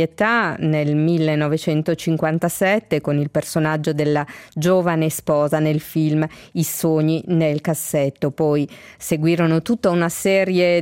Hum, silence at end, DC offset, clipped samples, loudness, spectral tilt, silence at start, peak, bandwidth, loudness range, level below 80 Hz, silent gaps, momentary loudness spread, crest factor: none; 0 s; under 0.1%; under 0.1%; -19 LUFS; -6 dB/octave; 0 s; -6 dBFS; 17 kHz; 1 LU; -56 dBFS; none; 5 LU; 14 dB